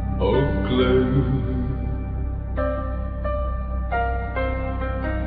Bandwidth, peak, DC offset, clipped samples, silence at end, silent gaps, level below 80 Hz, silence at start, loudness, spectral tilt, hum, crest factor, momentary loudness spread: 4.7 kHz; -8 dBFS; under 0.1%; under 0.1%; 0 s; none; -26 dBFS; 0 s; -24 LUFS; -11 dB/octave; none; 14 dB; 9 LU